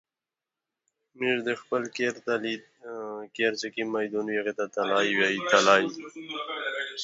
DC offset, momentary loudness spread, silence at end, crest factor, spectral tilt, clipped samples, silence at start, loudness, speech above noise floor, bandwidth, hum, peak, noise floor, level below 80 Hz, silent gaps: under 0.1%; 15 LU; 0 s; 24 dB; -3 dB/octave; under 0.1%; 1.15 s; -27 LUFS; over 63 dB; 8 kHz; none; -6 dBFS; under -90 dBFS; -78 dBFS; none